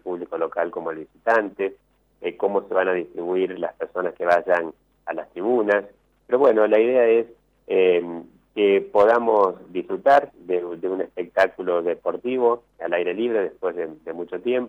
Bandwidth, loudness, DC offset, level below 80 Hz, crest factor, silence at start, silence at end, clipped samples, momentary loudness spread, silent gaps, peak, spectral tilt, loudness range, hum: 7.6 kHz; -22 LUFS; under 0.1%; -66 dBFS; 16 dB; 0.05 s; 0 s; under 0.1%; 14 LU; none; -6 dBFS; -6.5 dB/octave; 5 LU; none